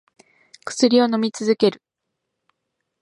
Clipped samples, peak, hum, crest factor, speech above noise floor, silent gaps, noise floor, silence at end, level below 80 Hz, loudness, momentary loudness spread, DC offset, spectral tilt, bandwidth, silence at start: under 0.1%; -2 dBFS; none; 20 dB; 61 dB; none; -79 dBFS; 1.3 s; -74 dBFS; -19 LUFS; 12 LU; under 0.1%; -4.5 dB/octave; 11 kHz; 0.65 s